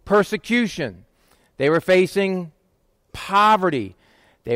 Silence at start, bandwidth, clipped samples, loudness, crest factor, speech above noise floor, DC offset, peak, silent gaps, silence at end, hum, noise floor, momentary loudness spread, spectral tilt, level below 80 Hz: 0.05 s; 16 kHz; under 0.1%; -20 LUFS; 14 dB; 46 dB; under 0.1%; -6 dBFS; none; 0 s; none; -64 dBFS; 19 LU; -5.5 dB/octave; -54 dBFS